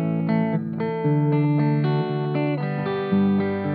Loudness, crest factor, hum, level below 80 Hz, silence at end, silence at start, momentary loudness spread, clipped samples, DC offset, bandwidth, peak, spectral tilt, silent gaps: -22 LUFS; 12 dB; none; -74 dBFS; 0 s; 0 s; 5 LU; under 0.1%; under 0.1%; 4.7 kHz; -10 dBFS; -11.5 dB/octave; none